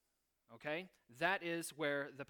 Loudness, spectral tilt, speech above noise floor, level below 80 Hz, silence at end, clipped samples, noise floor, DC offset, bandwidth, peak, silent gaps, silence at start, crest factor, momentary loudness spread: -41 LUFS; -3.5 dB/octave; 41 dB; -84 dBFS; 0.05 s; under 0.1%; -82 dBFS; under 0.1%; 19 kHz; -20 dBFS; none; 0.5 s; 22 dB; 10 LU